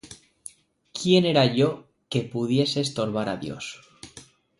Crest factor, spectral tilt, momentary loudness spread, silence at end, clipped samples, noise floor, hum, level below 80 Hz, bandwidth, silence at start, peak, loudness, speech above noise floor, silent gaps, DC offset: 20 dB; -5.5 dB/octave; 24 LU; 0.35 s; under 0.1%; -50 dBFS; none; -62 dBFS; 11.5 kHz; 0.05 s; -6 dBFS; -24 LUFS; 27 dB; none; under 0.1%